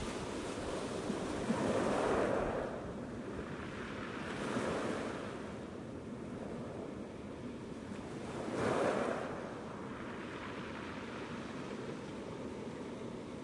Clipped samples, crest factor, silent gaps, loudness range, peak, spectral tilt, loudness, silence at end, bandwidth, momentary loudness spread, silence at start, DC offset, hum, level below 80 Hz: under 0.1%; 20 dB; none; 7 LU; -20 dBFS; -5.5 dB/octave; -40 LUFS; 0 s; 11.5 kHz; 11 LU; 0 s; under 0.1%; none; -60 dBFS